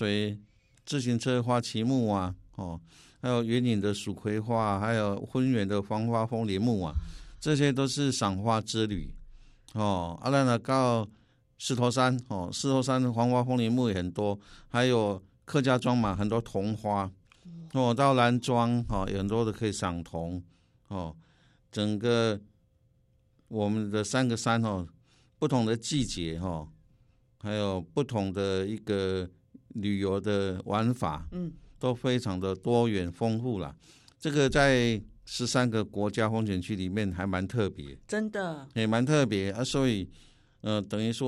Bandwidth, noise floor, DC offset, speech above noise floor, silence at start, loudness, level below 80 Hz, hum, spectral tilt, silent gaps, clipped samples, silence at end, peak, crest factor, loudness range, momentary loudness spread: 12.5 kHz; -67 dBFS; under 0.1%; 38 dB; 0 s; -29 LUFS; -50 dBFS; none; -6 dB/octave; none; under 0.1%; 0 s; -8 dBFS; 20 dB; 4 LU; 12 LU